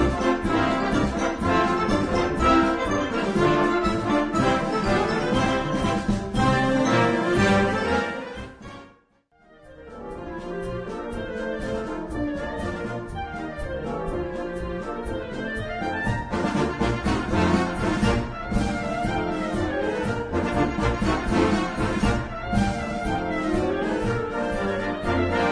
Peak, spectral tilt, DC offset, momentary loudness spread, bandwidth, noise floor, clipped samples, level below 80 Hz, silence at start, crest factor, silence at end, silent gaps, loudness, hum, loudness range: -6 dBFS; -6 dB/octave; under 0.1%; 11 LU; 10.5 kHz; -61 dBFS; under 0.1%; -36 dBFS; 0 s; 18 dB; 0 s; none; -24 LUFS; none; 9 LU